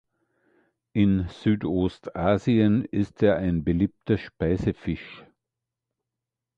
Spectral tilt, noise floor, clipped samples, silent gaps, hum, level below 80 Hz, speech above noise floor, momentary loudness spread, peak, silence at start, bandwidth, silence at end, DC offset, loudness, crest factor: -9 dB/octave; -87 dBFS; under 0.1%; none; none; -44 dBFS; 63 dB; 9 LU; -8 dBFS; 0.95 s; 7.6 kHz; 1.35 s; under 0.1%; -25 LUFS; 18 dB